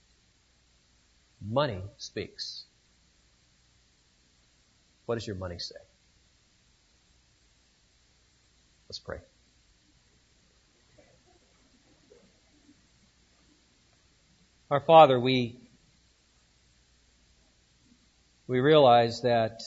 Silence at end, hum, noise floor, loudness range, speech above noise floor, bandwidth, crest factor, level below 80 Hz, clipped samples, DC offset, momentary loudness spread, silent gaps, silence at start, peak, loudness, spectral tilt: 0 s; none; -66 dBFS; 23 LU; 42 dB; 8 kHz; 26 dB; -64 dBFS; under 0.1%; under 0.1%; 25 LU; none; 1.4 s; -6 dBFS; -25 LUFS; -6 dB/octave